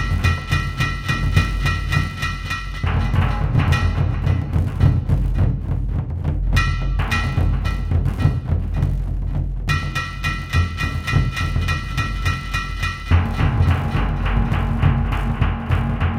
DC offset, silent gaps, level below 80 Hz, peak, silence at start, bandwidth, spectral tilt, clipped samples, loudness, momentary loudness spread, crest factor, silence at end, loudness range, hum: under 0.1%; none; -24 dBFS; -2 dBFS; 0 s; 13 kHz; -6 dB/octave; under 0.1%; -21 LUFS; 6 LU; 16 dB; 0 s; 2 LU; none